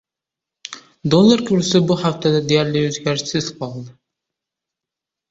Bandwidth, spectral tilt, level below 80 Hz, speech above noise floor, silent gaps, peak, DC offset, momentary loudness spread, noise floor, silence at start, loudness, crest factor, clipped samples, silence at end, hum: 8 kHz; -5.5 dB/octave; -54 dBFS; 69 dB; none; -2 dBFS; under 0.1%; 21 LU; -86 dBFS; 0.7 s; -17 LUFS; 18 dB; under 0.1%; 1.4 s; none